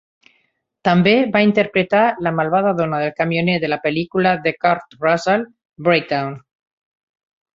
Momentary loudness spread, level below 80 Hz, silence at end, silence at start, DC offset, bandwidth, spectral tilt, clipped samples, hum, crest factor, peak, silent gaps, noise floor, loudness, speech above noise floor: 8 LU; -58 dBFS; 1.15 s; 0.85 s; under 0.1%; 7.8 kHz; -7 dB/octave; under 0.1%; none; 18 dB; -2 dBFS; 5.65-5.70 s; -66 dBFS; -17 LUFS; 49 dB